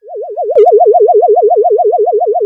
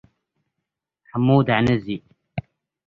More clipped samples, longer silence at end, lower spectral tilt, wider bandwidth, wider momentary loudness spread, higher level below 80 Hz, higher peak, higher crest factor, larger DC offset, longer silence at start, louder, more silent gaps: neither; second, 0 s vs 0.45 s; second, -6.5 dB/octave vs -8.5 dB/octave; second, 3.1 kHz vs 7 kHz; second, 6 LU vs 18 LU; second, -68 dBFS vs -50 dBFS; first, 0 dBFS vs -4 dBFS; second, 8 dB vs 20 dB; neither; second, 0.05 s vs 1.15 s; first, -8 LUFS vs -20 LUFS; neither